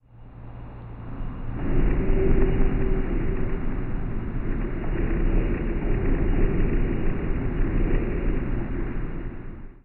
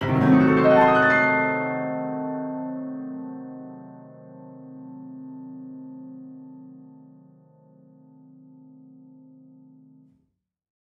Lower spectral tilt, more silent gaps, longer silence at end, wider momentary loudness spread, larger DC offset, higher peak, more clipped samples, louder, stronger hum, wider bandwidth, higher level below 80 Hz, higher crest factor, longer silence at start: about the same, -8.5 dB/octave vs -8.5 dB/octave; neither; second, 0.05 s vs 4.2 s; second, 14 LU vs 27 LU; neither; about the same, -8 dBFS vs -6 dBFS; neither; second, -28 LUFS vs -21 LUFS; neither; second, 3 kHz vs 6.8 kHz; first, -24 dBFS vs -60 dBFS; second, 14 dB vs 20 dB; first, 0.15 s vs 0 s